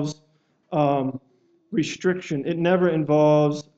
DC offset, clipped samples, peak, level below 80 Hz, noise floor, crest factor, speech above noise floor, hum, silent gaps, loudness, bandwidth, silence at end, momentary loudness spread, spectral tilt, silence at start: under 0.1%; under 0.1%; -6 dBFS; -66 dBFS; -64 dBFS; 16 dB; 43 dB; none; none; -22 LUFS; 8 kHz; 0.15 s; 13 LU; -7 dB/octave; 0 s